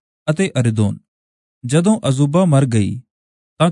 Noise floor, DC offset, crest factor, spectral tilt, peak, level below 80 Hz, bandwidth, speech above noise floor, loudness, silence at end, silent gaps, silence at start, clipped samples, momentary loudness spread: under -90 dBFS; under 0.1%; 16 dB; -6.5 dB/octave; -2 dBFS; -56 dBFS; 11 kHz; over 75 dB; -17 LUFS; 0 s; 1.08-1.61 s, 3.10-3.57 s; 0.25 s; under 0.1%; 12 LU